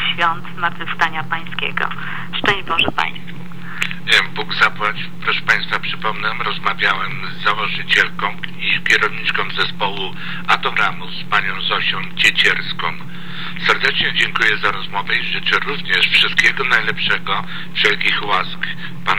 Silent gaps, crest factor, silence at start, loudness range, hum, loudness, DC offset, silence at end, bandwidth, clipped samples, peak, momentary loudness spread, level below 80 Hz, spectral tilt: none; 18 dB; 0 s; 4 LU; none; -17 LUFS; 7%; 0 s; over 20 kHz; under 0.1%; -2 dBFS; 10 LU; -50 dBFS; -3 dB/octave